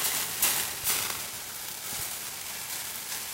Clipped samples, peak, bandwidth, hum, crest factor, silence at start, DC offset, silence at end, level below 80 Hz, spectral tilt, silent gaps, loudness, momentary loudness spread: under 0.1%; -6 dBFS; 16 kHz; none; 26 dB; 0 s; under 0.1%; 0 s; -62 dBFS; 0.5 dB/octave; none; -29 LUFS; 10 LU